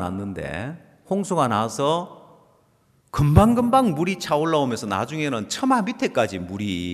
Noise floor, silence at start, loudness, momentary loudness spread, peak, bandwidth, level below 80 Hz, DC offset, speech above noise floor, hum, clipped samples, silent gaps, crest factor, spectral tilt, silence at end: -61 dBFS; 0 s; -22 LUFS; 13 LU; -4 dBFS; 14 kHz; -42 dBFS; under 0.1%; 40 dB; none; under 0.1%; none; 18 dB; -6 dB/octave; 0 s